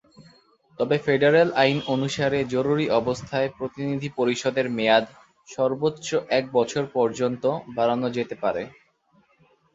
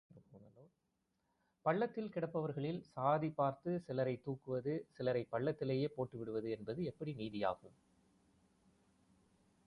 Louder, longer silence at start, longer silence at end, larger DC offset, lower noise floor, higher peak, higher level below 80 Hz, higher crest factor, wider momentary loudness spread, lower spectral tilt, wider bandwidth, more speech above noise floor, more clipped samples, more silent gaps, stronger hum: first, -24 LUFS vs -40 LUFS; about the same, 0.2 s vs 0.15 s; second, 1.05 s vs 2 s; neither; second, -63 dBFS vs -84 dBFS; first, -4 dBFS vs -22 dBFS; first, -60 dBFS vs -76 dBFS; about the same, 20 dB vs 20 dB; about the same, 8 LU vs 7 LU; second, -5.5 dB/octave vs -9 dB/octave; second, 8 kHz vs 11 kHz; second, 40 dB vs 45 dB; neither; neither; neither